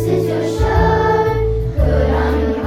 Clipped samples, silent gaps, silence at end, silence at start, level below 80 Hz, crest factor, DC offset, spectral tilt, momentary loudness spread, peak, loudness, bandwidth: under 0.1%; none; 0 s; 0 s; -20 dBFS; 12 dB; under 0.1%; -7.5 dB/octave; 4 LU; -2 dBFS; -16 LUFS; 15 kHz